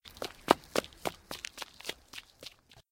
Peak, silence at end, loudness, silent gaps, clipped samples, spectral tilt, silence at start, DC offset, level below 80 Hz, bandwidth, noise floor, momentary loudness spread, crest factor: -2 dBFS; 0.45 s; -35 LUFS; none; under 0.1%; -3 dB/octave; 0.05 s; under 0.1%; -62 dBFS; 17 kHz; -53 dBFS; 20 LU; 36 dB